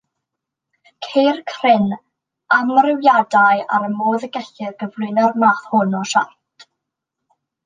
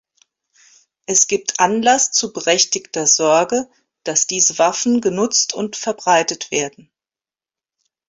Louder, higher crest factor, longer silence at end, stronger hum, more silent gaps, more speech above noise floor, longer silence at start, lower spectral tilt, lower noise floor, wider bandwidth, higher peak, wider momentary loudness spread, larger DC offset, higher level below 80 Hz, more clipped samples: about the same, -16 LUFS vs -16 LUFS; about the same, 16 dB vs 18 dB; about the same, 1.4 s vs 1.4 s; neither; neither; second, 65 dB vs over 73 dB; about the same, 1 s vs 1.1 s; first, -5 dB/octave vs -1.5 dB/octave; second, -81 dBFS vs under -90 dBFS; first, 9.6 kHz vs 8 kHz; about the same, -2 dBFS vs -2 dBFS; first, 14 LU vs 9 LU; neither; second, -70 dBFS vs -62 dBFS; neither